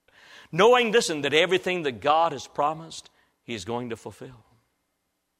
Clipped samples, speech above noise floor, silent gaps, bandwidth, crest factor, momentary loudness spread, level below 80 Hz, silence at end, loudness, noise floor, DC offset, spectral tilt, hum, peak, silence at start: under 0.1%; 53 dB; none; 14.5 kHz; 20 dB; 18 LU; -66 dBFS; 1.1 s; -23 LUFS; -77 dBFS; under 0.1%; -3.5 dB/octave; none; -6 dBFS; 0.55 s